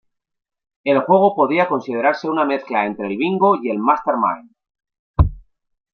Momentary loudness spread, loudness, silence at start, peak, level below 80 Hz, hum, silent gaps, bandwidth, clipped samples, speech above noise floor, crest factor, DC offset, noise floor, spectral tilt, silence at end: 7 LU; -18 LUFS; 0.85 s; -2 dBFS; -32 dBFS; none; 4.99-5.14 s; 6.4 kHz; under 0.1%; 22 dB; 18 dB; under 0.1%; -39 dBFS; -8.5 dB/octave; 0.55 s